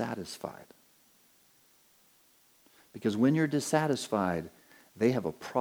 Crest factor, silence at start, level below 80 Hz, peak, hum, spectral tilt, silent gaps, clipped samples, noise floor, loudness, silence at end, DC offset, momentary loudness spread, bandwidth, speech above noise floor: 20 dB; 0 s; -70 dBFS; -12 dBFS; none; -5.5 dB/octave; none; under 0.1%; -65 dBFS; -30 LUFS; 0 s; under 0.1%; 17 LU; over 20 kHz; 35 dB